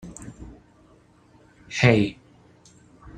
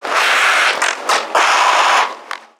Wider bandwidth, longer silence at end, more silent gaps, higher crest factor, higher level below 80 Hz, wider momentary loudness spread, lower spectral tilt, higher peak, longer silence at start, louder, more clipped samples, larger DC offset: second, 10 kHz vs 19.5 kHz; about the same, 0.1 s vs 0.2 s; neither; first, 26 dB vs 14 dB; first, -52 dBFS vs -78 dBFS; first, 26 LU vs 6 LU; first, -6 dB/octave vs 2 dB/octave; about the same, -2 dBFS vs 0 dBFS; about the same, 0.05 s vs 0 s; second, -21 LUFS vs -13 LUFS; neither; neither